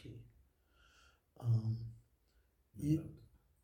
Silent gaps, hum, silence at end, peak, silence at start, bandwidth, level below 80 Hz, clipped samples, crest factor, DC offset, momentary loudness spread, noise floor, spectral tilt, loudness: none; none; 0.4 s; -22 dBFS; 0.05 s; 15 kHz; -66 dBFS; under 0.1%; 20 dB; under 0.1%; 20 LU; -74 dBFS; -9 dB/octave; -39 LUFS